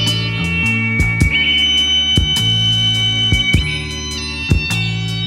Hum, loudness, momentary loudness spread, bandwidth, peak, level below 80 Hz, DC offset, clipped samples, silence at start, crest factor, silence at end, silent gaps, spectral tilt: none; -14 LUFS; 9 LU; 15.5 kHz; 0 dBFS; -26 dBFS; under 0.1%; under 0.1%; 0 s; 16 dB; 0 s; none; -3.5 dB/octave